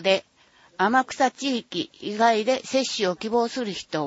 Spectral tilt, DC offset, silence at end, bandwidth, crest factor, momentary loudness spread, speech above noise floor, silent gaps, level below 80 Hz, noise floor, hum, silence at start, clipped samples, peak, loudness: -3.5 dB/octave; under 0.1%; 0 s; 8 kHz; 18 dB; 9 LU; 33 dB; none; -68 dBFS; -57 dBFS; none; 0 s; under 0.1%; -6 dBFS; -24 LUFS